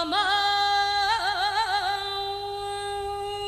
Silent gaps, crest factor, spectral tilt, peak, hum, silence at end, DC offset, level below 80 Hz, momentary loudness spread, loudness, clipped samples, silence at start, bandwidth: none; 14 dB; -1.5 dB/octave; -12 dBFS; none; 0 s; under 0.1%; -52 dBFS; 9 LU; -25 LUFS; under 0.1%; 0 s; 14 kHz